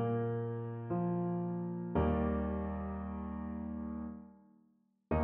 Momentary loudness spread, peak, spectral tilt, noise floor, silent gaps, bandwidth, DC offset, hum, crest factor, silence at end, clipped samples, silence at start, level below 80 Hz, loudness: 8 LU; -20 dBFS; -9.5 dB/octave; -72 dBFS; none; 3.5 kHz; under 0.1%; none; 16 dB; 0 s; under 0.1%; 0 s; -48 dBFS; -37 LUFS